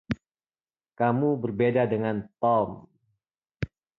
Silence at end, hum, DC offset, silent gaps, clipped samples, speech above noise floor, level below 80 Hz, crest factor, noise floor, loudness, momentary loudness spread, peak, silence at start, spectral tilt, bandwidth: 0.3 s; none; under 0.1%; 3.38-3.42 s; under 0.1%; over 65 dB; -54 dBFS; 18 dB; under -90 dBFS; -26 LUFS; 13 LU; -10 dBFS; 0.1 s; -9.5 dB/octave; 6.4 kHz